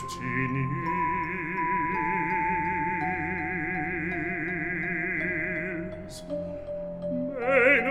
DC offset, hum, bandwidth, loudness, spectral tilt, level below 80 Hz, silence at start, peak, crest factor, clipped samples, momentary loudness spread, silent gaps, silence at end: under 0.1%; none; 13.5 kHz; -28 LUFS; -6.5 dB/octave; -52 dBFS; 0 s; -8 dBFS; 20 dB; under 0.1%; 9 LU; none; 0 s